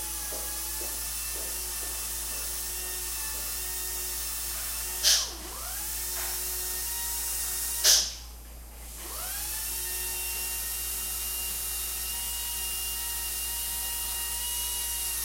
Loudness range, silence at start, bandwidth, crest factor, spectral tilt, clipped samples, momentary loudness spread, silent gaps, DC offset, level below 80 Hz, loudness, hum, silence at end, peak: 4 LU; 0 s; 16.5 kHz; 24 dB; 0.5 dB/octave; under 0.1%; 8 LU; none; under 0.1%; -44 dBFS; -29 LUFS; 60 Hz at -60 dBFS; 0 s; -8 dBFS